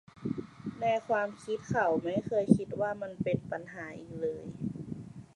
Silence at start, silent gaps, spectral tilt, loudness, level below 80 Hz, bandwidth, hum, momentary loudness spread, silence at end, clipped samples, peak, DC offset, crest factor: 0.15 s; none; -7.5 dB/octave; -33 LUFS; -62 dBFS; 11 kHz; none; 15 LU; 0.1 s; under 0.1%; -8 dBFS; under 0.1%; 26 dB